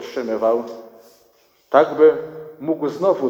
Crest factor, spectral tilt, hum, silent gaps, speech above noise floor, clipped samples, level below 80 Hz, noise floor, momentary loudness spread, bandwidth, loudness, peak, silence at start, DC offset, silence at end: 18 dB; -6.5 dB/octave; none; none; 40 dB; under 0.1%; -66 dBFS; -57 dBFS; 19 LU; 16 kHz; -18 LUFS; 0 dBFS; 0 s; under 0.1%; 0 s